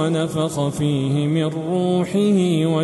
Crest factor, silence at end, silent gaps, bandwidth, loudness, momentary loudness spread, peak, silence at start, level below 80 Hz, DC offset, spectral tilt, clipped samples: 10 dB; 0 s; none; 12.5 kHz; -20 LUFS; 4 LU; -8 dBFS; 0 s; -54 dBFS; under 0.1%; -7 dB/octave; under 0.1%